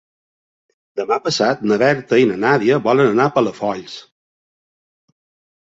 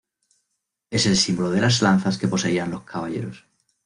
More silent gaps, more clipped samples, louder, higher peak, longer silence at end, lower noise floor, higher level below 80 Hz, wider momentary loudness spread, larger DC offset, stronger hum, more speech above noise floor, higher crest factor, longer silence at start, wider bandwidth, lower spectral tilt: neither; neither; first, -16 LUFS vs -21 LUFS; first, -2 dBFS vs -6 dBFS; first, 1.8 s vs 0.45 s; first, under -90 dBFS vs -78 dBFS; second, -62 dBFS vs -54 dBFS; about the same, 14 LU vs 12 LU; neither; neither; first, over 74 dB vs 57 dB; about the same, 18 dB vs 18 dB; about the same, 0.95 s vs 0.9 s; second, 8 kHz vs 11 kHz; about the same, -5.5 dB/octave vs -4.5 dB/octave